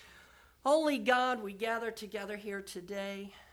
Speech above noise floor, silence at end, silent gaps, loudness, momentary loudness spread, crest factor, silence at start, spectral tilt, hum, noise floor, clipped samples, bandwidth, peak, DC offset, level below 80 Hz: 26 dB; 0.1 s; none; -34 LUFS; 13 LU; 20 dB; 0 s; -4 dB/octave; none; -60 dBFS; under 0.1%; 18.5 kHz; -14 dBFS; under 0.1%; -70 dBFS